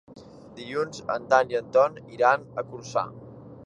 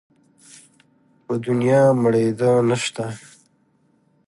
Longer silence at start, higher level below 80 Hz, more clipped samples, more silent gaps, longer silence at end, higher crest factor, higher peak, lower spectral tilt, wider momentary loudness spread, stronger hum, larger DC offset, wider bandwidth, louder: second, 0.1 s vs 1.3 s; about the same, -64 dBFS vs -64 dBFS; neither; neither; second, 0 s vs 1.1 s; first, 22 dB vs 16 dB; about the same, -4 dBFS vs -6 dBFS; second, -4.5 dB/octave vs -6 dB/octave; first, 20 LU vs 14 LU; neither; neither; second, 9 kHz vs 11.5 kHz; second, -25 LUFS vs -19 LUFS